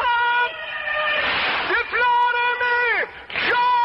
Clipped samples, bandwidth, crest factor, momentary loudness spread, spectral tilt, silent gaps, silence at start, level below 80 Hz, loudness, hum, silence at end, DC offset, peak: under 0.1%; 5.8 kHz; 10 dB; 6 LU; -4 dB/octave; none; 0 s; -54 dBFS; -20 LUFS; none; 0 s; under 0.1%; -10 dBFS